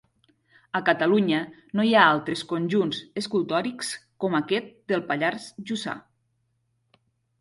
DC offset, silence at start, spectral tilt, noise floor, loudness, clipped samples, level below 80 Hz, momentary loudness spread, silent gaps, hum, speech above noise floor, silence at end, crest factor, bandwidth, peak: under 0.1%; 0.75 s; -5 dB/octave; -72 dBFS; -25 LUFS; under 0.1%; -70 dBFS; 13 LU; none; none; 48 dB; 1.4 s; 22 dB; 11.5 kHz; -4 dBFS